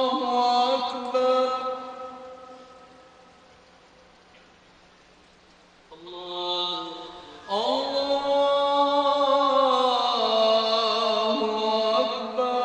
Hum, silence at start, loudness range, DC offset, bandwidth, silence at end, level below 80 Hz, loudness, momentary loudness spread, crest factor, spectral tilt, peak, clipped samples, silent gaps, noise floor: none; 0 s; 13 LU; under 0.1%; 9.2 kHz; 0 s; -66 dBFS; -23 LUFS; 18 LU; 16 dB; -3 dB/octave; -10 dBFS; under 0.1%; none; -55 dBFS